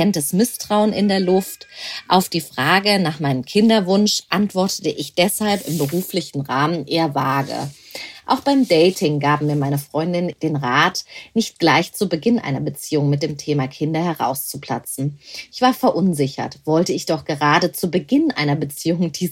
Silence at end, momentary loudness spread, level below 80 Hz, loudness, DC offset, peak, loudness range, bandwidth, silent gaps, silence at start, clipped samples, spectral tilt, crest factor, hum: 0 s; 10 LU; -60 dBFS; -19 LUFS; under 0.1%; -2 dBFS; 4 LU; 16.5 kHz; none; 0 s; under 0.1%; -5 dB/octave; 18 dB; none